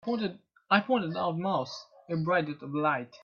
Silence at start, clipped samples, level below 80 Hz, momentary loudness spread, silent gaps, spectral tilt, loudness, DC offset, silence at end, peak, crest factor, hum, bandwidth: 0.05 s; under 0.1%; -72 dBFS; 10 LU; none; -6.5 dB/octave; -30 LUFS; under 0.1%; 0.1 s; -8 dBFS; 22 dB; none; 7 kHz